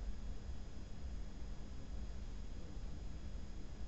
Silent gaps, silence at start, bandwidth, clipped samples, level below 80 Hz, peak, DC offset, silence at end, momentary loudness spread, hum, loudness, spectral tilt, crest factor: none; 0 s; 8 kHz; under 0.1%; -48 dBFS; -32 dBFS; 0.4%; 0 s; 2 LU; none; -52 LUFS; -6.5 dB/octave; 12 dB